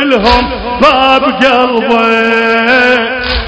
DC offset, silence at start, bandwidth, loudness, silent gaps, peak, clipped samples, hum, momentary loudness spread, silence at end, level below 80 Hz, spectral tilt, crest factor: 0.4%; 0 s; 8 kHz; -8 LUFS; none; 0 dBFS; 2%; none; 4 LU; 0 s; -26 dBFS; -5 dB/octave; 8 dB